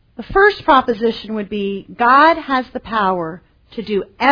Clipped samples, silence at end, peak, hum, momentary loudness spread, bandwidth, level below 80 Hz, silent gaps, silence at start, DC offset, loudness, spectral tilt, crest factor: under 0.1%; 0 s; 0 dBFS; none; 13 LU; 5.4 kHz; -42 dBFS; none; 0.2 s; under 0.1%; -16 LUFS; -6.5 dB/octave; 16 dB